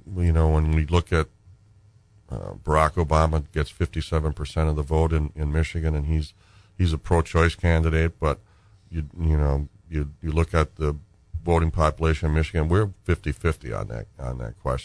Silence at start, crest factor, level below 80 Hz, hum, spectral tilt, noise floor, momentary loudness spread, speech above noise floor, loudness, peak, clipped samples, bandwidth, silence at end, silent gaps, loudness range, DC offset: 0.05 s; 18 dB; -30 dBFS; none; -7 dB/octave; -55 dBFS; 12 LU; 32 dB; -24 LUFS; -6 dBFS; under 0.1%; 10.5 kHz; 0 s; none; 2 LU; under 0.1%